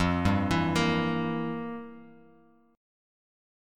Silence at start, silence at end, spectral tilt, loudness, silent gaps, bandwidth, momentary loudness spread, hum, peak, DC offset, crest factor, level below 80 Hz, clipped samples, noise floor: 0 s; 1 s; -6 dB/octave; -28 LUFS; none; 15 kHz; 14 LU; none; -12 dBFS; under 0.1%; 18 dB; -50 dBFS; under 0.1%; -60 dBFS